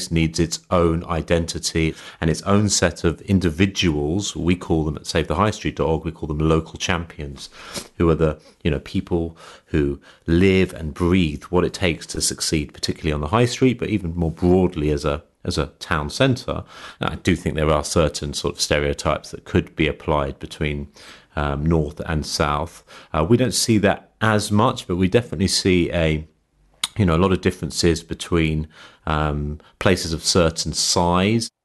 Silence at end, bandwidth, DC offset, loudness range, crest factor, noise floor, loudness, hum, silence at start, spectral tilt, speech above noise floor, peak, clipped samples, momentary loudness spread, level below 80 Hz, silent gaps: 0.15 s; 12 kHz; under 0.1%; 3 LU; 18 dB; -59 dBFS; -21 LUFS; none; 0 s; -5 dB/octave; 39 dB; -2 dBFS; under 0.1%; 9 LU; -36 dBFS; none